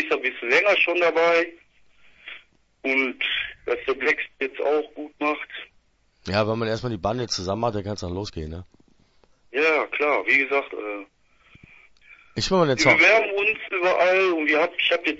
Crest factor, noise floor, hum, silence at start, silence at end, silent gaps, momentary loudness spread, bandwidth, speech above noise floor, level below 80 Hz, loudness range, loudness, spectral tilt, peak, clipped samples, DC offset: 20 dB; -62 dBFS; none; 0 s; 0 s; none; 15 LU; 8 kHz; 40 dB; -52 dBFS; 8 LU; -22 LUFS; -4.5 dB/octave; -4 dBFS; under 0.1%; under 0.1%